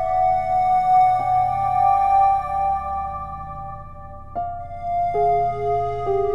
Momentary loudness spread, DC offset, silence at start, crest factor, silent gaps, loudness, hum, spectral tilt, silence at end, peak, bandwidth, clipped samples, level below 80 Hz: 16 LU; under 0.1%; 0 s; 12 dB; none; -20 LUFS; none; -7.5 dB/octave; 0 s; -8 dBFS; 6.8 kHz; under 0.1%; -42 dBFS